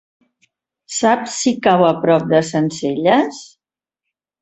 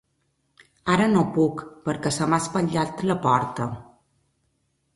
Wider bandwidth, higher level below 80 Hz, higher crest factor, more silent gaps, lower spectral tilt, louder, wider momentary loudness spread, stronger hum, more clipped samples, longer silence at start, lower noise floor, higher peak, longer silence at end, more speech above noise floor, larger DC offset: second, 8.4 kHz vs 11.5 kHz; about the same, -60 dBFS vs -56 dBFS; about the same, 16 dB vs 20 dB; neither; about the same, -5 dB/octave vs -5.5 dB/octave; first, -16 LUFS vs -23 LUFS; second, 8 LU vs 12 LU; neither; neither; about the same, 0.9 s vs 0.85 s; first, -86 dBFS vs -71 dBFS; first, -2 dBFS vs -6 dBFS; second, 0.95 s vs 1.1 s; first, 71 dB vs 48 dB; neither